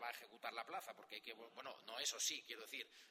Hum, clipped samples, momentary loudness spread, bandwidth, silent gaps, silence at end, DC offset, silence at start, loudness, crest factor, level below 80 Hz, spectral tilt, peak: none; under 0.1%; 13 LU; 16 kHz; none; 0 s; under 0.1%; 0 s; -47 LUFS; 22 dB; under -90 dBFS; 1.5 dB/octave; -28 dBFS